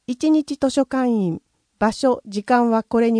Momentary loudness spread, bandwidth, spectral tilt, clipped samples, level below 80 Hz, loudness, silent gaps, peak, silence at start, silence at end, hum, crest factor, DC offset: 6 LU; 10.5 kHz; -6 dB/octave; under 0.1%; -56 dBFS; -20 LUFS; none; -6 dBFS; 0.1 s; 0 s; none; 14 dB; under 0.1%